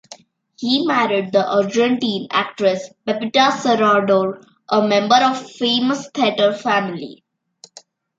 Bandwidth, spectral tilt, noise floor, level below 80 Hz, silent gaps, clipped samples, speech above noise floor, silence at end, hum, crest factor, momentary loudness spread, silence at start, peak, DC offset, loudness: 8 kHz; -4.5 dB/octave; -49 dBFS; -68 dBFS; none; under 0.1%; 32 dB; 1.05 s; none; 16 dB; 10 LU; 0.1 s; -2 dBFS; under 0.1%; -17 LUFS